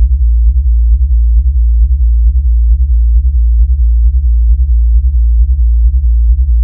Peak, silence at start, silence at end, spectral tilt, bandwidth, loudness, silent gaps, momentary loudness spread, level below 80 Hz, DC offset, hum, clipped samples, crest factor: 0 dBFS; 0 s; 0 s; -14.5 dB/octave; 0.3 kHz; -11 LUFS; none; 1 LU; -8 dBFS; under 0.1%; none; under 0.1%; 8 dB